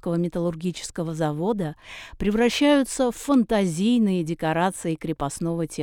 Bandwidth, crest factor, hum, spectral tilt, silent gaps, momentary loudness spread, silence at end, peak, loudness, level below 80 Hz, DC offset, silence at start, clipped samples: 17.5 kHz; 16 dB; none; -5.5 dB/octave; none; 10 LU; 0 s; -8 dBFS; -24 LUFS; -46 dBFS; under 0.1%; 0.05 s; under 0.1%